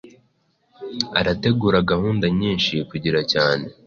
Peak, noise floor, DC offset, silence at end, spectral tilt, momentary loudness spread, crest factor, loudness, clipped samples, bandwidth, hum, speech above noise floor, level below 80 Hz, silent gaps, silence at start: -2 dBFS; -65 dBFS; under 0.1%; 0.15 s; -6 dB/octave; 6 LU; 18 dB; -20 LUFS; under 0.1%; 7.2 kHz; none; 44 dB; -44 dBFS; none; 0.05 s